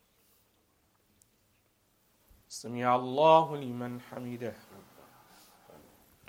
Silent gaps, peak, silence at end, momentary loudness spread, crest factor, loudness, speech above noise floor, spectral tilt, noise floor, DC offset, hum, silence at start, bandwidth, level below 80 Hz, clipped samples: none; -8 dBFS; 1.5 s; 20 LU; 26 dB; -29 LUFS; 42 dB; -5.5 dB/octave; -71 dBFS; under 0.1%; none; 2.5 s; 16.5 kHz; -76 dBFS; under 0.1%